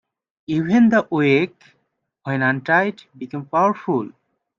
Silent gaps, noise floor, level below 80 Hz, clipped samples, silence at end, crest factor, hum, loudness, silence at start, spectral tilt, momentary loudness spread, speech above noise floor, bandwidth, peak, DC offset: none; -71 dBFS; -64 dBFS; under 0.1%; 0.5 s; 16 dB; none; -19 LUFS; 0.5 s; -7.5 dB/octave; 16 LU; 52 dB; 7.2 kHz; -4 dBFS; under 0.1%